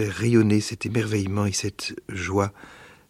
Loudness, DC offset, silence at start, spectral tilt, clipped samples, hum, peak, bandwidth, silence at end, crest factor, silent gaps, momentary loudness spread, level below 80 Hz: -24 LUFS; under 0.1%; 0 s; -5.5 dB/octave; under 0.1%; none; -6 dBFS; 15 kHz; 0.2 s; 18 dB; none; 11 LU; -54 dBFS